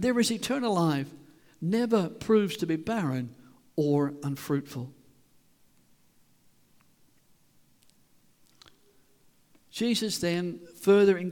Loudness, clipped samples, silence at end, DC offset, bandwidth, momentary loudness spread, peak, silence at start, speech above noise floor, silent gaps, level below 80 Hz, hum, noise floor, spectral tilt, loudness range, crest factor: -28 LUFS; under 0.1%; 0 s; under 0.1%; 19 kHz; 13 LU; -12 dBFS; 0 s; 36 dB; none; -66 dBFS; none; -63 dBFS; -5.5 dB/octave; 11 LU; 18 dB